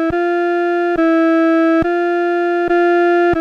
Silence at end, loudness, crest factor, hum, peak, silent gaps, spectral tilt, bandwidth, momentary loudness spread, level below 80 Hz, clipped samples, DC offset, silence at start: 0 s; -14 LUFS; 8 dB; none; -6 dBFS; none; -7 dB/octave; 6.2 kHz; 3 LU; -44 dBFS; under 0.1%; under 0.1%; 0 s